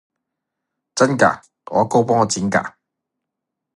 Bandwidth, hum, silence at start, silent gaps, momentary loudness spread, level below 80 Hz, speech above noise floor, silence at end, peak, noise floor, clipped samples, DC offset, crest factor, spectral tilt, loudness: 11.5 kHz; none; 0.95 s; none; 14 LU; -56 dBFS; 65 dB; 1.1 s; 0 dBFS; -81 dBFS; under 0.1%; under 0.1%; 20 dB; -4.5 dB/octave; -18 LUFS